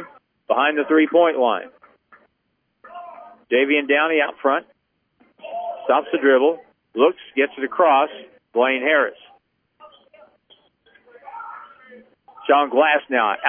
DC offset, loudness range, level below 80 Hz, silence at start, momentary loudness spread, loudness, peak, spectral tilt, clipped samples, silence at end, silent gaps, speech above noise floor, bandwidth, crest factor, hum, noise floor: under 0.1%; 5 LU; -78 dBFS; 0 s; 21 LU; -19 LUFS; -2 dBFS; -7 dB/octave; under 0.1%; 0 s; none; 53 dB; 3.6 kHz; 18 dB; none; -71 dBFS